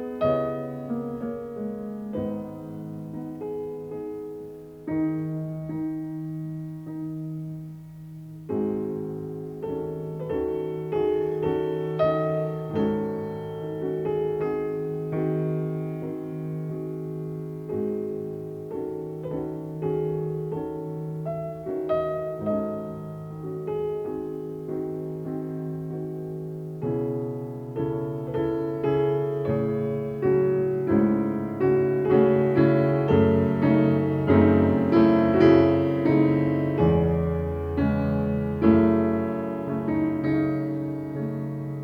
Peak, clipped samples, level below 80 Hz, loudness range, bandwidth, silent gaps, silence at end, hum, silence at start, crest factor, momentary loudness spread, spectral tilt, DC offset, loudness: -6 dBFS; under 0.1%; -52 dBFS; 12 LU; 5.6 kHz; none; 0 s; none; 0 s; 20 dB; 14 LU; -10 dB/octave; under 0.1%; -26 LUFS